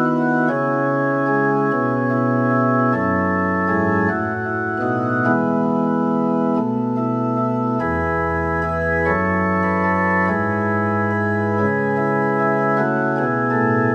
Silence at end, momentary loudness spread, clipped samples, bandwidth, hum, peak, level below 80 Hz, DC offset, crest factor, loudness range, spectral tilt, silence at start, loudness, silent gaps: 0 s; 3 LU; under 0.1%; 7 kHz; none; -4 dBFS; -44 dBFS; under 0.1%; 14 dB; 2 LU; -9.5 dB/octave; 0 s; -19 LUFS; none